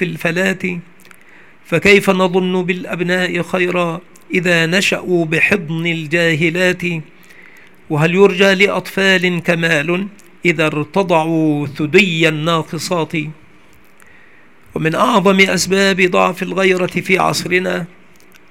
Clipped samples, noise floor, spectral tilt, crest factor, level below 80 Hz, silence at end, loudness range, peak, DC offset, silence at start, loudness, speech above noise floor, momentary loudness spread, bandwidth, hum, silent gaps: under 0.1%; -48 dBFS; -5 dB/octave; 16 dB; -54 dBFS; 0.65 s; 3 LU; 0 dBFS; 0.6%; 0 s; -14 LUFS; 33 dB; 10 LU; 16.5 kHz; none; none